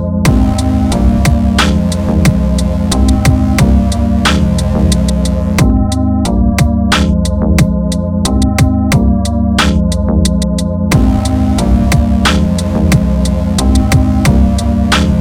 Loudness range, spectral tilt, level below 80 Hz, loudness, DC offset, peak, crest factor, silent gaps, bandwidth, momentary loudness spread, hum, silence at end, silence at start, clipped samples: 1 LU; -6 dB/octave; -14 dBFS; -11 LUFS; under 0.1%; 0 dBFS; 10 dB; none; 16.5 kHz; 3 LU; none; 0 s; 0 s; 0.4%